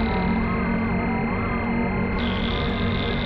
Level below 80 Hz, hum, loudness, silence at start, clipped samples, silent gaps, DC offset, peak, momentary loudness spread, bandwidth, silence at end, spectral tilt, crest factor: -32 dBFS; none; -24 LUFS; 0 s; under 0.1%; none; under 0.1%; -12 dBFS; 1 LU; 5.8 kHz; 0 s; -9 dB/octave; 10 dB